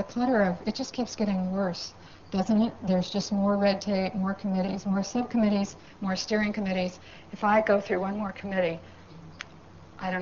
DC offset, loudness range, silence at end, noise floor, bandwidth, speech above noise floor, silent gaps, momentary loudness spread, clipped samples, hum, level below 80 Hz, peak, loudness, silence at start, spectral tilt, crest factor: 0.2%; 2 LU; 0 s; -50 dBFS; 7.4 kHz; 22 dB; none; 14 LU; under 0.1%; none; -58 dBFS; -10 dBFS; -28 LUFS; 0 s; -5 dB/octave; 18 dB